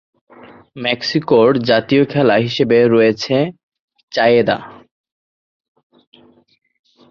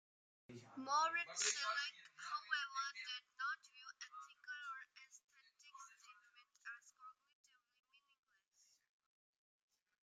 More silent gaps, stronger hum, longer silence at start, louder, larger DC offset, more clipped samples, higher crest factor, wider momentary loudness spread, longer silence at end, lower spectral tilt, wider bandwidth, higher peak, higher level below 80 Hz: first, 3.63-3.69 s, 3.79-3.88 s, 4.03-4.08 s vs 5.24-5.28 s; neither; first, 0.75 s vs 0.5 s; first, -15 LUFS vs -44 LUFS; neither; neither; second, 16 dB vs 24 dB; second, 9 LU vs 24 LU; second, 2.4 s vs 2.9 s; first, -6.5 dB/octave vs 0.5 dB/octave; second, 7 kHz vs 13 kHz; first, -2 dBFS vs -26 dBFS; first, -56 dBFS vs under -90 dBFS